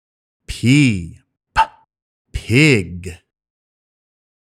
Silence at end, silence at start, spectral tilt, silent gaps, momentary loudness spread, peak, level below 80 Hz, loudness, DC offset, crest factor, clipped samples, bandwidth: 1.35 s; 0.5 s; -5.5 dB/octave; 2.02-2.25 s; 20 LU; 0 dBFS; -38 dBFS; -16 LUFS; under 0.1%; 20 dB; under 0.1%; 14 kHz